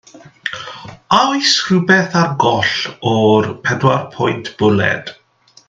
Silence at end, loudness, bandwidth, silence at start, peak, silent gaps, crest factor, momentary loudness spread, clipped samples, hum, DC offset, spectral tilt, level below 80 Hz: 0.55 s; -14 LUFS; 9.2 kHz; 0.15 s; 0 dBFS; none; 16 dB; 14 LU; under 0.1%; none; under 0.1%; -4.5 dB/octave; -56 dBFS